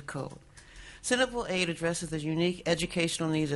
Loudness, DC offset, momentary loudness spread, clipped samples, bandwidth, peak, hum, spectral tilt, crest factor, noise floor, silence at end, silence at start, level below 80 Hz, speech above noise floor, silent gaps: -30 LUFS; under 0.1%; 12 LU; under 0.1%; 11.5 kHz; -12 dBFS; none; -4 dB/octave; 18 dB; -50 dBFS; 0 s; 0 s; -54 dBFS; 20 dB; none